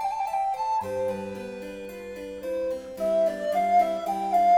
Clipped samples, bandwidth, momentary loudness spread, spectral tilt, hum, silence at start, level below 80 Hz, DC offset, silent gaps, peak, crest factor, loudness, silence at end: under 0.1%; 17.5 kHz; 15 LU; -5.5 dB/octave; none; 0 s; -60 dBFS; under 0.1%; none; -12 dBFS; 14 dB; -27 LUFS; 0 s